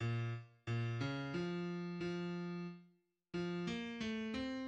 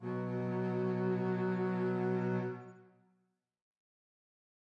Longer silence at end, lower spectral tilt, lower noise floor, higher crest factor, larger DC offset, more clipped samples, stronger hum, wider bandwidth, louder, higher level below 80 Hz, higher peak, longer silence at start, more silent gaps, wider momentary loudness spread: second, 0 s vs 1.95 s; second, -7 dB/octave vs -10 dB/octave; second, -72 dBFS vs -79 dBFS; about the same, 14 dB vs 12 dB; neither; neither; neither; first, 8.6 kHz vs 5.6 kHz; second, -43 LUFS vs -35 LUFS; first, -70 dBFS vs -84 dBFS; about the same, -28 dBFS vs -26 dBFS; about the same, 0 s vs 0 s; neither; about the same, 7 LU vs 6 LU